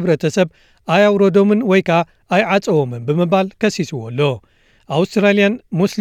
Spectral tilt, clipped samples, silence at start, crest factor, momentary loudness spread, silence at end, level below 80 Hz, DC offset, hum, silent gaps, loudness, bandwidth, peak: -6.5 dB/octave; under 0.1%; 0 s; 14 dB; 8 LU; 0 s; -58 dBFS; under 0.1%; none; none; -16 LUFS; 14 kHz; -2 dBFS